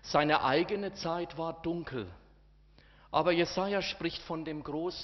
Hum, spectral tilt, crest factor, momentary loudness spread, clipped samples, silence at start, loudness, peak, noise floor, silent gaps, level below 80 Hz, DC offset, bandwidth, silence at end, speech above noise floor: none; -3.5 dB/octave; 22 dB; 11 LU; under 0.1%; 0.05 s; -32 LUFS; -10 dBFS; -61 dBFS; none; -58 dBFS; under 0.1%; 6.2 kHz; 0 s; 29 dB